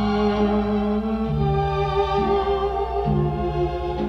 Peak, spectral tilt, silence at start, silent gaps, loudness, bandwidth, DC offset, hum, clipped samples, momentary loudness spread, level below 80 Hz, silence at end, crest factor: -8 dBFS; -8.5 dB/octave; 0 s; none; -22 LUFS; 6.6 kHz; under 0.1%; none; under 0.1%; 3 LU; -32 dBFS; 0 s; 14 dB